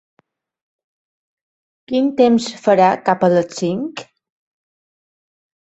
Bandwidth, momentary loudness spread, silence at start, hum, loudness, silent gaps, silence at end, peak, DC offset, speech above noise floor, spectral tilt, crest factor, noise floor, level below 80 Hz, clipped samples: 8.2 kHz; 11 LU; 1.9 s; none; -16 LUFS; none; 1.75 s; -2 dBFS; under 0.1%; over 75 dB; -6 dB/octave; 18 dB; under -90 dBFS; -64 dBFS; under 0.1%